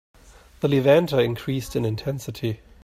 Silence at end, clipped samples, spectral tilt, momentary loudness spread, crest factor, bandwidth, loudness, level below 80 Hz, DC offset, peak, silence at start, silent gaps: 0.25 s; under 0.1%; -6.5 dB/octave; 12 LU; 18 dB; 15.5 kHz; -23 LUFS; -50 dBFS; under 0.1%; -4 dBFS; 0.6 s; none